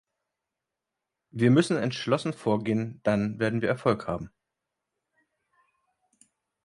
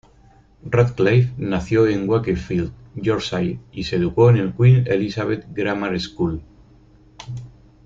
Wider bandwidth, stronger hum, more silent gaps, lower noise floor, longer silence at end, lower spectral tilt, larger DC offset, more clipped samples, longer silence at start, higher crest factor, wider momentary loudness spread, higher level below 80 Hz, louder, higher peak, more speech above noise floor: first, 11.5 kHz vs 7.6 kHz; neither; neither; first, -87 dBFS vs -51 dBFS; first, 2.4 s vs 0.35 s; second, -6.5 dB/octave vs -8 dB/octave; neither; neither; first, 1.35 s vs 0.65 s; first, 22 dB vs 16 dB; second, 12 LU vs 16 LU; second, -60 dBFS vs -44 dBFS; second, -27 LUFS vs -20 LUFS; second, -8 dBFS vs -2 dBFS; first, 61 dB vs 33 dB